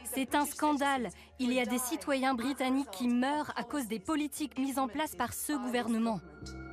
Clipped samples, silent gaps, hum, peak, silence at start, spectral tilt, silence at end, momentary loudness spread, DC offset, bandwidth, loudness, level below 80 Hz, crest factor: under 0.1%; none; none; -18 dBFS; 0 s; -3.5 dB/octave; 0 s; 6 LU; under 0.1%; 15.5 kHz; -33 LUFS; -60 dBFS; 16 dB